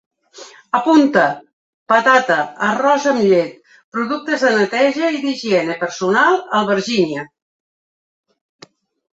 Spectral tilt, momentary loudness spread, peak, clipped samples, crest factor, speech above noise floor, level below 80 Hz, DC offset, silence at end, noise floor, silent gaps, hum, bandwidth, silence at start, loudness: -4.5 dB/octave; 9 LU; 0 dBFS; under 0.1%; 16 dB; 25 dB; -64 dBFS; under 0.1%; 1.9 s; -41 dBFS; 1.53-1.86 s, 3.84-3.92 s; none; 8 kHz; 0.35 s; -16 LUFS